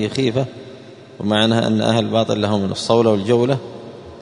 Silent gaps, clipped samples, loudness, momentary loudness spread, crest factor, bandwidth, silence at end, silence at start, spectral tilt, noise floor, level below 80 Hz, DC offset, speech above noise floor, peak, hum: none; under 0.1%; -18 LUFS; 19 LU; 18 dB; 11 kHz; 0 s; 0 s; -6 dB/octave; -39 dBFS; -54 dBFS; under 0.1%; 22 dB; 0 dBFS; none